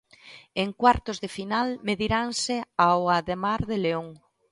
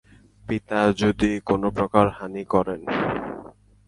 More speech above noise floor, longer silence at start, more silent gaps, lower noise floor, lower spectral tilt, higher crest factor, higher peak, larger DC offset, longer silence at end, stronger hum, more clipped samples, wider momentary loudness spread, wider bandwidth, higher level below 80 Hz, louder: about the same, 25 dB vs 22 dB; second, 0.25 s vs 0.45 s; neither; first, -50 dBFS vs -44 dBFS; second, -4.5 dB/octave vs -6.5 dB/octave; about the same, 20 dB vs 22 dB; second, -6 dBFS vs -2 dBFS; neither; about the same, 0.35 s vs 0.4 s; neither; neither; about the same, 11 LU vs 13 LU; about the same, 11.5 kHz vs 11.5 kHz; about the same, -48 dBFS vs -46 dBFS; about the same, -25 LUFS vs -23 LUFS